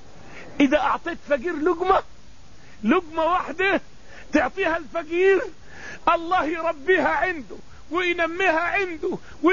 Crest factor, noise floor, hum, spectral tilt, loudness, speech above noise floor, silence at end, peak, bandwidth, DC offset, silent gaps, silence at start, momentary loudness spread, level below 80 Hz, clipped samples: 18 dB; -49 dBFS; none; -5 dB/octave; -23 LUFS; 27 dB; 0 s; -6 dBFS; 7.4 kHz; 1%; none; 0.25 s; 10 LU; -50 dBFS; under 0.1%